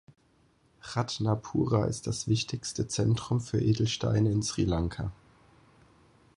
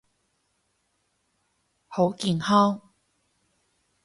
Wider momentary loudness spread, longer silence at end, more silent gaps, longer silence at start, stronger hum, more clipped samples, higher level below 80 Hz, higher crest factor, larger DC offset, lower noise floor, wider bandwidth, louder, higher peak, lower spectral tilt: second, 7 LU vs 15 LU; about the same, 1.25 s vs 1.25 s; neither; second, 0.85 s vs 1.9 s; neither; neither; first, -48 dBFS vs -66 dBFS; about the same, 18 dB vs 20 dB; neither; second, -66 dBFS vs -73 dBFS; about the same, 11 kHz vs 11.5 kHz; second, -30 LUFS vs -24 LUFS; second, -12 dBFS vs -8 dBFS; about the same, -5.5 dB/octave vs -6 dB/octave